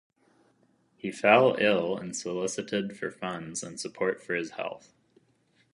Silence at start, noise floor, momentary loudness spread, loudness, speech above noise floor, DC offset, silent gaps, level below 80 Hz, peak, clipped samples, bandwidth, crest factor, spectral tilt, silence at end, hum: 1.05 s; -68 dBFS; 17 LU; -28 LUFS; 40 dB; under 0.1%; none; -72 dBFS; -4 dBFS; under 0.1%; 11.5 kHz; 26 dB; -4 dB/octave; 0.95 s; none